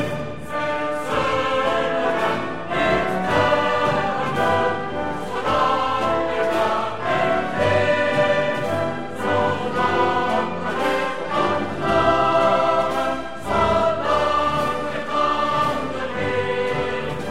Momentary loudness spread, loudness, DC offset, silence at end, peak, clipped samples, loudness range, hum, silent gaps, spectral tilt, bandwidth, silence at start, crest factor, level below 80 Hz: 7 LU; -21 LUFS; 2%; 0 s; -6 dBFS; under 0.1%; 2 LU; none; none; -5.5 dB/octave; 15.5 kHz; 0 s; 16 dB; -46 dBFS